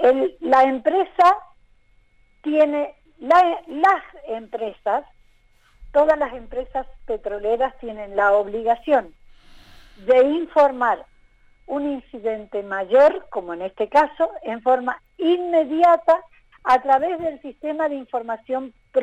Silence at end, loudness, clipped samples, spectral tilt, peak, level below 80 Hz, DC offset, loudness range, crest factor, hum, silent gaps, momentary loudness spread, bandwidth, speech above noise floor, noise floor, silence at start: 0 s; -20 LUFS; under 0.1%; -5 dB/octave; -6 dBFS; -50 dBFS; under 0.1%; 4 LU; 14 dB; none; none; 14 LU; 9.2 kHz; 37 dB; -56 dBFS; 0 s